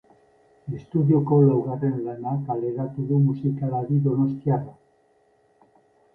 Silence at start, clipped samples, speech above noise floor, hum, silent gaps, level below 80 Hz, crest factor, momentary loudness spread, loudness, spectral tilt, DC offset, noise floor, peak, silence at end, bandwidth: 0.65 s; under 0.1%; 40 dB; none; none; -60 dBFS; 18 dB; 11 LU; -23 LUFS; -13 dB/octave; under 0.1%; -62 dBFS; -6 dBFS; 1.45 s; 2.1 kHz